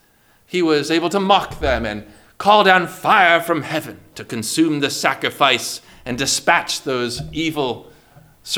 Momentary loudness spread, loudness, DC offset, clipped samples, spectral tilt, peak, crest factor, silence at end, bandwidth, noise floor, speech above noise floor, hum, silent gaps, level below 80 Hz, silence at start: 14 LU; -17 LUFS; under 0.1%; under 0.1%; -3 dB/octave; 0 dBFS; 18 dB; 0 s; over 20 kHz; -55 dBFS; 37 dB; none; none; -42 dBFS; 0.5 s